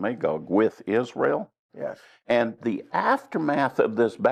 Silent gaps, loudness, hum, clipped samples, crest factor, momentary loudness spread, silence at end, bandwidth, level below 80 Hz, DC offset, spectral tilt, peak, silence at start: 1.59-1.69 s; -25 LUFS; none; under 0.1%; 16 dB; 12 LU; 0 s; 10.5 kHz; -72 dBFS; under 0.1%; -7 dB/octave; -8 dBFS; 0 s